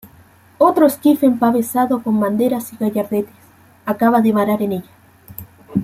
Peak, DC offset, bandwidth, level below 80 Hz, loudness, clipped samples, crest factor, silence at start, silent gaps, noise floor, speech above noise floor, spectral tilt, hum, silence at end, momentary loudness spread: -2 dBFS; under 0.1%; 16.5 kHz; -58 dBFS; -16 LUFS; under 0.1%; 16 dB; 0.05 s; none; -48 dBFS; 32 dB; -6.5 dB/octave; none; 0 s; 17 LU